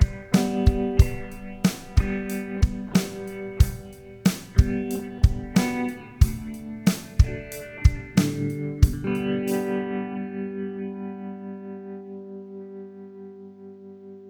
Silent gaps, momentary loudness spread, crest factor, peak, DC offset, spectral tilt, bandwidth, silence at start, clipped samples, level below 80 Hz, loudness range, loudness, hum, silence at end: none; 17 LU; 22 dB; -2 dBFS; under 0.1%; -6.5 dB/octave; over 20 kHz; 0 s; under 0.1%; -28 dBFS; 10 LU; -25 LUFS; 50 Hz at -45 dBFS; 0 s